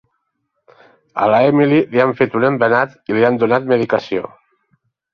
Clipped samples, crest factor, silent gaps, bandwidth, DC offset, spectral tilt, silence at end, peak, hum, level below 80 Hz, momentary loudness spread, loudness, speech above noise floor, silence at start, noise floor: under 0.1%; 16 dB; none; 6.6 kHz; under 0.1%; -8.5 dB/octave; 0.85 s; -2 dBFS; none; -60 dBFS; 10 LU; -15 LUFS; 57 dB; 1.15 s; -71 dBFS